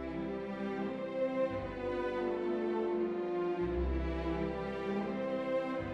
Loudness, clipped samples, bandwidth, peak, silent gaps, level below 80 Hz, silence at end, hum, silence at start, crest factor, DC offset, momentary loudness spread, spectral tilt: -36 LUFS; under 0.1%; 7.4 kHz; -22 dBFS; none; -46 dBFS; 0 s; none; 0 s; 12 dB; under 0.1%; 4 LU; -8 dB/octave